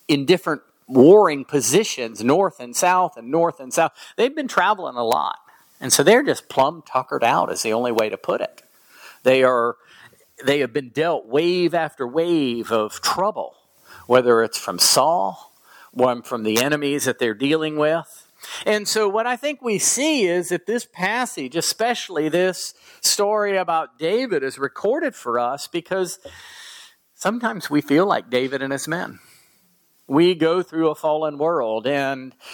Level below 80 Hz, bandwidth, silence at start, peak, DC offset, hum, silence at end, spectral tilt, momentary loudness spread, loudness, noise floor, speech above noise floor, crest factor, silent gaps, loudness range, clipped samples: -70 dBFS; 19 kHz; 0.1 s; -2 dBFS; under 0.1%; none; 0 s; -3.5 dB/octave; 10 LU; -20 LUFS; -60 dBFS; 40 dB; 20 dB; none; 4 LU; under 0.1%